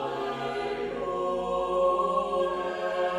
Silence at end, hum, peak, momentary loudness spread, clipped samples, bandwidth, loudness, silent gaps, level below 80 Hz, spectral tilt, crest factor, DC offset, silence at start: 0 s; none; -16 dBFS; 7 LU; under 0.1%; 10.5 kHz; -29 LUFS; none; -56 dBFS; -5.5 dB/octave; 14 dB; under 0.1%; 0 s